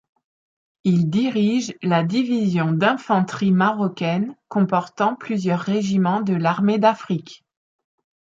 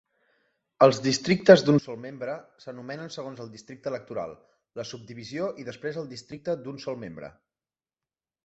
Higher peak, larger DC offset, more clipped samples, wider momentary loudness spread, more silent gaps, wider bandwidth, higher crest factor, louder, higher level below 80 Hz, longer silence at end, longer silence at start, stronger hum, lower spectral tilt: about the same, -4 dBFS vs -2 dBFS; neither; neither; second, 5 LU vs 22 LU; neither; about the same, 7.6 kHz vs 8 kHz; second, 16 dB vs 24 dB; first, -20 LUFS vs -25 LUFS; about the same, -64 dBFS vs -66 dBFS; about the same, 1.05 s vs 1.15 s; about the same, 0.85 s vs 0.8 s; neither; first, -7 dB/octave vs -5.5 dB/octave